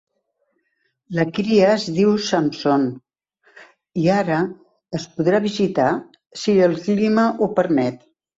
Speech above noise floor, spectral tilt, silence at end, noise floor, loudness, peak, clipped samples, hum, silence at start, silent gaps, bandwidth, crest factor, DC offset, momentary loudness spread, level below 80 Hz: 52 dB; -6 dB/octave; 0.4 s; -70 dBFS; -19 LUFS; -4 dBFS; under 0.1%; none; 1.1 s; none; 8 kHz; 16 dB; under 0.1%; 11 LU; -60 dBFS